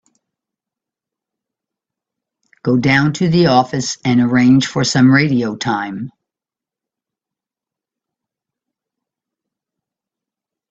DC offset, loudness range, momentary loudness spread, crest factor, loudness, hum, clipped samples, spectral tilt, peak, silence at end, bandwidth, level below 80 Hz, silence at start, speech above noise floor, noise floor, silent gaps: under 0.1%; 10 LU; 11 LU; 18 dB; -14 LUFS; none; under 0.1%; -5.5 dB/octave; 0 dBFS; 4.6 s; 8 kHz; -54 dBFS; 2.65 s; 74 dB; -88 dBFS; none